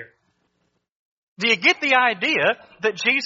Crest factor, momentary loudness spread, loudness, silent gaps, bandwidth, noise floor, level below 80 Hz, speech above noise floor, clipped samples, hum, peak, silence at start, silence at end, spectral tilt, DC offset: 20 dB; 8 LU; -19 LUFS; 0.92-1.36 s; 7.6 kHz; -71 dBFS; -72 dBFS; 51 dB; under 0.1%; none; -2 dBFS; 0 s; 0 s; 0 dB/octave; under 0.1%